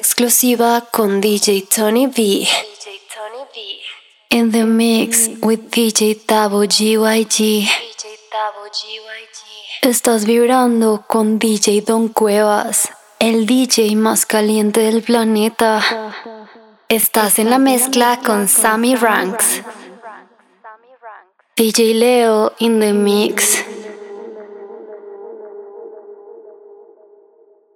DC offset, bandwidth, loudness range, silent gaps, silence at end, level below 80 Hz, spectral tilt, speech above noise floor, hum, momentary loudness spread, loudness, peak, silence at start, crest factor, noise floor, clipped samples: under 0.1%; 18 kHz; 4 LU; none; 1.25 s; -66 dBFS; -3 dB/octave; 37 dB; none; 20 LU; -14 LUFS; -2 dBFS; 0 s; 14 dB; -51 dBFS; under 0.1%